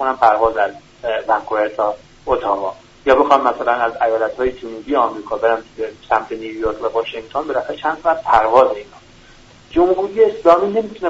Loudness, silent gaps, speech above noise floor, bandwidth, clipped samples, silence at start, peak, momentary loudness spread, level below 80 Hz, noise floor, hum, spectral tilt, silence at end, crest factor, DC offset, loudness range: -17 LUFS; none; 28 dB; 8 kHz; under 0.1%; 0 s; 0 dBFS; 10 LU; -44 dBFS; -44 dBFS; none; -5.5 dB/octave; 0 s; 18 dB; under 0.1%; 4 LU